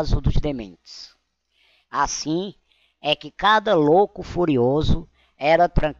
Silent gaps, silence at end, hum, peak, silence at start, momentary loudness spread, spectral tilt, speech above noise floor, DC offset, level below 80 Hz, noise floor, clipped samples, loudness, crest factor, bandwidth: none; 0.05 s; none; -6 dBFS; 0 s; 17 LU; -5.5 dB/octave; 46 dB; under 0.1%; -30 dBFS; -66 dBFS; under 0.1%; -21 LUFS; 16 dB; 7.6 kHz